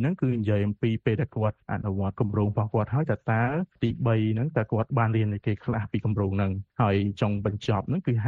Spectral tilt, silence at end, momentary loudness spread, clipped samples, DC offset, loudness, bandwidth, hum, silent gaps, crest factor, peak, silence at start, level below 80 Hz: -9 dB/octave; 0 s; 4 LU; under 0.1%; under 0.1%; -27 LUFS; 6.8 kHz; none; none; 16 dB; -10 dBFS; 0 s; -54 dBFS